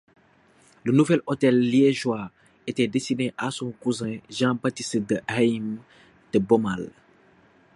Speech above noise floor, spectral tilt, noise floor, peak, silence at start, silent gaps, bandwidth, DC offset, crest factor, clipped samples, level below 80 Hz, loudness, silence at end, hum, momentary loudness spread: 35 dB; -6 dB/octave; -59 dBFS; -6 dBFS; 0.85 s; none; 11.5 kHz; under 0.1%; 18 dB; under 0.1%; -62 dBFS; -24 LUFS; 0.85 s; none; 13 LU